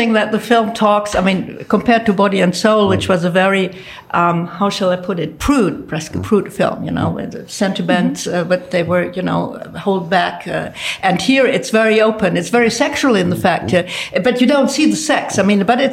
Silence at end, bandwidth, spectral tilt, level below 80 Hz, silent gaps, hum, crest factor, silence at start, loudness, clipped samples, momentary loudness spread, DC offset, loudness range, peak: 0 s; 16 kHz; -5 dB/octave; -44 dBFS; none; none; 14 dB; 0 s; -15 LUFS; under 0.1%; 8 LU; under 0.1%; 4 LU; -2 dBFS